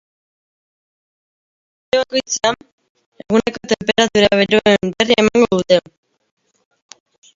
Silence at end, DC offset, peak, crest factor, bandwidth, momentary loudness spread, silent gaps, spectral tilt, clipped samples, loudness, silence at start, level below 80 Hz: 1.6 s; under 0.1%; 0 dBFS; 18 dB; 7.8 kHz; 7 LU; 2.72-2.78 s, 2.90-2.95 s, 3.06-3.12 s; -3.5 dB/octave; under 0.1%; -15 LUFS; 1.95 s; -50 dBFS